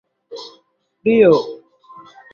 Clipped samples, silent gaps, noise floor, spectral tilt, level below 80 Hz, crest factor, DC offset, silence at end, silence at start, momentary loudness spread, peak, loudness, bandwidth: under 0.1%; none; -59 dBFS; -7 dB/octave; -62 dBFS; 18 dB; under 0.1%; 0.8 s; 0.3 s; 26 LU; -2 dBFS; -15 LUFS; 6.8 kHz